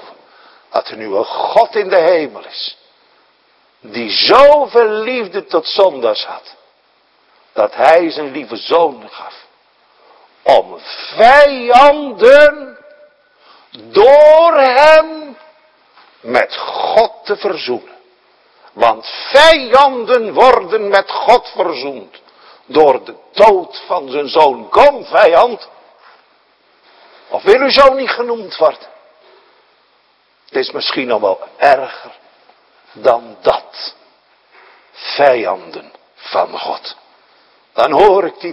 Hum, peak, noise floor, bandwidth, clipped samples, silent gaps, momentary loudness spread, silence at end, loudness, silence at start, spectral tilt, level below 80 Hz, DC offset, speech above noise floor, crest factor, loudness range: none; 0 dBFS; -55 dBFS; 11 kHz; 1%; none; 18 LU; 0 s; -11 LUFS; 0.75 s; -3.5 dB/octave; -48 dBFS; under 0.1%; 44 dB; 12 dB; 8 LU